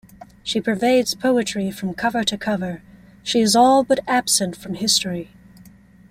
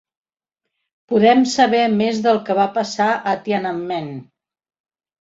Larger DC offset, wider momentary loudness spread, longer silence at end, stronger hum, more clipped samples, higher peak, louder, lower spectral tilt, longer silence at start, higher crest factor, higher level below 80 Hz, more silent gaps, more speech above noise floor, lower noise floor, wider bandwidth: neither; first, 16 LU vs 11 LU; second, 0.85 s vs 1 s; first, 60 Hz at -45 dBFS vs none; neither; about the same, -4 dBFS vs -2 dBFS; about the same, -19 LUFS vs -17 LUFS; second, -3 dB/octave vs -5 dB/octave; second, 0.2 s vs 1.1 s; about the same, 18 dB vs 18 dB; first, -54 dBFS vs -64 dBFS; neither; second, 28 dB vs 65 dB; second, -47 dBFS vs -82 dBFS; first, 16 kHz vs 8 kHz